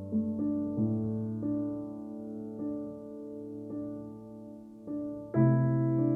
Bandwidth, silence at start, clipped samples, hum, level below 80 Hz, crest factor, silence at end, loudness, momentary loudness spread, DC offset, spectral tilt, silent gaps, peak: 2.5 kHz; 0 s; under 0.1%; none; -64 dBFS; 18 dB; 0 s; -33 LUFS; 17 LU; under 0.1%; -12.5 dB/octave; none; -14 dBFS